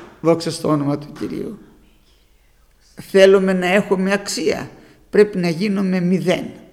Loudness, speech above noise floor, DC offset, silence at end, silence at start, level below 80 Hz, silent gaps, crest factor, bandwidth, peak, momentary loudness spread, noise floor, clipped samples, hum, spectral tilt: -18 LUFS; 37 dB; under 0.1%; 0.15 s; 0 s; -52 dBFS; none; 18 dB; 15 kHz; 0 dBFS; 14 LU; -54 dBFS; under 0.1%; none; -5.5 dB/octave